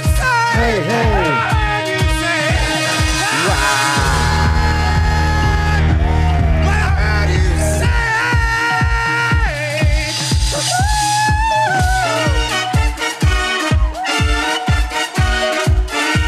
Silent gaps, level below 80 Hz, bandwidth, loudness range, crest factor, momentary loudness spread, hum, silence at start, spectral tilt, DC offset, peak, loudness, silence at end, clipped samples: none; -20 dBFS; 14.5 kHz; 1 LU; 12 dB; 3 LU; none; 0 s; -4 dB/octave; under 0.1%; -2 dBFS; -15 LUFS; 0 s; under 0.1%